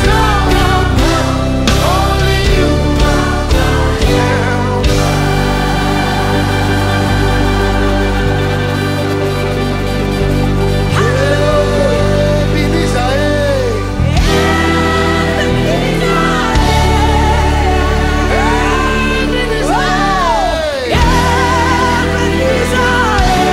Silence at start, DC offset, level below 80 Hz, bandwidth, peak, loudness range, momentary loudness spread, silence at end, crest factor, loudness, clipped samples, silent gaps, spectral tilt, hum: 0 s; under 0.1%; -18 dBFS; 16 kHz; 0 dBFS; 2 LU; 3 LU; 0 s; 12 dB; -12 LUFS; under 0.1%; none; -5.5 dB/octave; none